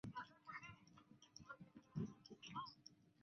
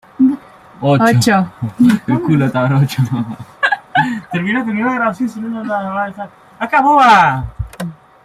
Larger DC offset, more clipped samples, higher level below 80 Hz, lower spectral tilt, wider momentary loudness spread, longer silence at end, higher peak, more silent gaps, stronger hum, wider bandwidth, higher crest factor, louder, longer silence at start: neither; neither; second, -80 dBFS vs -42 dBFS; second, -4.5 dB/octave vs -6 dB/octave; about the same, 15 LU vs 16 LU; second, 0 s vs 0.3 s; second, -36 dBFS vs 0 dBFS; neither; neither; second, 6.6 kHz vs 15 kHz; first, 20 dB vs 14 dB; second, -56 LUFS vs -14 LUFS; second, 0.05 s vs 0.2 s